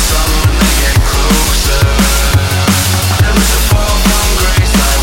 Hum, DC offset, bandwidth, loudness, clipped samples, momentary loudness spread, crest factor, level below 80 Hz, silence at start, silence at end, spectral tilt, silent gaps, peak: none; under 0.1%; 16.5 kHz; -10 LUFS; under 0.1%; 1 LU; 10 dB; -14 dBFS; 0 s; 0 s; -3.5 dB/octave; none; 0 dBFS